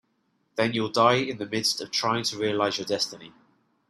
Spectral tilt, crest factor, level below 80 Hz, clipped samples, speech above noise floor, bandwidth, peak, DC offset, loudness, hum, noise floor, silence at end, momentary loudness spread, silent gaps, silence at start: -3.5 dB/octave; 20 dB; -68 dBFS; under 0.1%; 46 dB; 15 kHz; -6 dBFS; under 0.1%; -25 LUFS; none; -71 dBFS; 0.6 s; 8 LU; none; 0.55 s